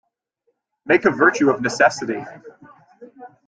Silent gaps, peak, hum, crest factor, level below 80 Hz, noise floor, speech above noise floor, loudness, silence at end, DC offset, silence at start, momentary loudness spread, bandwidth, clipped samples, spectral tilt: none; -2 dBFS; none; 20 dB; -64 dBFS; -71 dBFS; 53 dB; -18 LUFS; 0.2 s; under 0.1%; 0.85 s; 13 LU; 9.2 kHz; under 0.1%; -4.5 dB/octave